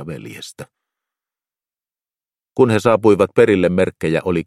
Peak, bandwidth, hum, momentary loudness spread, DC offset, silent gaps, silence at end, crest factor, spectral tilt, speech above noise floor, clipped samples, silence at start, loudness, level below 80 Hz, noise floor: 0 dBFS; 13.5 kHz; none; 19 LU; under 0.1%; none; 0.05 s; 18 dB; -7 dB/octave; over 74 dB; under 0.1%; 0 s; -15 LUFS; -52 dBFS; under -90 dBFS